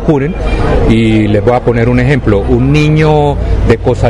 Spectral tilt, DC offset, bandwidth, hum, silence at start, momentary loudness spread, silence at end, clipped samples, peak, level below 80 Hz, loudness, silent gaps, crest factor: -8 dB/octave; under 0.1%; 10.5 kHz; none; 0 s; 4 LU; 0 s; 0.1%; 0 dBFS; -16 dBFS; -10 LUFS; none; 8 dB